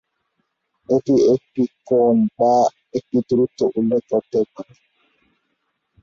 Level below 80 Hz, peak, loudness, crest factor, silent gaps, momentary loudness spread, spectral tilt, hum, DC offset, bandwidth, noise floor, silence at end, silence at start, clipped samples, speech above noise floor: -60 dBFS; -6 dBFS; -19 LUFS; 14 dB; none; 8 LU; -8 dB/octave; none; under 0.1%; 7.4 kHz; -72 dBFS; 1.4 s; 0.9 s; under 0.1%; 54 dB